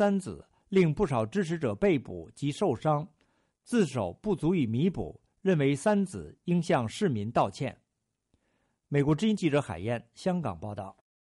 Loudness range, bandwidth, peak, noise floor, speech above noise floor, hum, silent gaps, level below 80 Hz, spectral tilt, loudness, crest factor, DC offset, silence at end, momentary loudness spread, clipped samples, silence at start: 3 LU; 11.5 kHz; -14 dBFS; -82 dBFS; 54 dB; none; none; -56 dBFS; -7 dB/octave; -29 LUFS; 16 dB; under 0.1%; 0.3 s; 13 LU; under 0.1%; 0 s